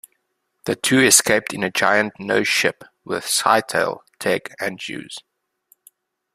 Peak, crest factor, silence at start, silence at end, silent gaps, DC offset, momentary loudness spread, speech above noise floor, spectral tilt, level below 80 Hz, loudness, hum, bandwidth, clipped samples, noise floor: 0 dBFS; 22 dB; 0.65 s; 1.15 s; none; under 0.1%; 18 LU; 53 dB; -2 dB/octave; -60 dBFS; -18 LUFS; none; 15.5 kHz; under 0.1%; -73 dBFS